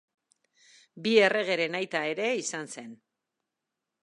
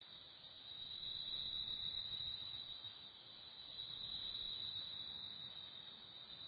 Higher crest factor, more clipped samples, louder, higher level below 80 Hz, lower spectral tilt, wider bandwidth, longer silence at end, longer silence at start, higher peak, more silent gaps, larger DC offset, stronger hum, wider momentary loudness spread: first, 24 dB vs 16 dB; neither; first, -27 LUFS vs -46 LUFS; second, -82 dBFS vs -72 dBFS; first, -3 dB/octave vs 0 dB/octave; first, 11 kHz vs 4.8 kHz; first, 1.1 s vs 0 s; first, 0.95 s vs 0 s; first, -8 dBFS vs -34 dBFS; neither; neither; neither; first, 18 LU vs 12 LU